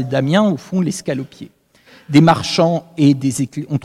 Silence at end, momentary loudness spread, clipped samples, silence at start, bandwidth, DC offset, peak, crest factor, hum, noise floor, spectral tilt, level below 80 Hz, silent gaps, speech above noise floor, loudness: 0.05 s; 11 LU; under 0.1%; 0 s; 13.5 kHz; under 0.1%; 0 dBFS; 16 dB; none; -48 dBFS; -6 dB/octave; -54 dBFS; none; 32 dB; -16 LUFS